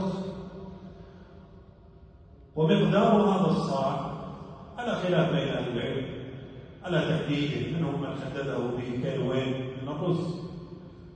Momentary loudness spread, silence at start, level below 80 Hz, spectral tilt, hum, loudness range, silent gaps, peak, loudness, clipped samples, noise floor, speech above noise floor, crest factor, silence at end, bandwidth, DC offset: 21 LU; 0 s; -54 dBFS; -7.5 dB/octave; none; 5 LU; none; -10 dBFS; -28 LUFS; under 0.1%; -52 dBFS; 25 dB; 20 dB; 0 s; 9 kHz; under 0.1%